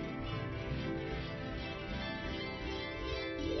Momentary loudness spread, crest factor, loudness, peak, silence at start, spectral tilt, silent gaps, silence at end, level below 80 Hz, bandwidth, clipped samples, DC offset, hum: 3 LU; 14 dB; -40 LUFS; -26 dBFS; 0 s; -4.5 dB/octave; none; 0 s; -48 dBFS; 6 kHz; under 0.1%; under 0.1%; none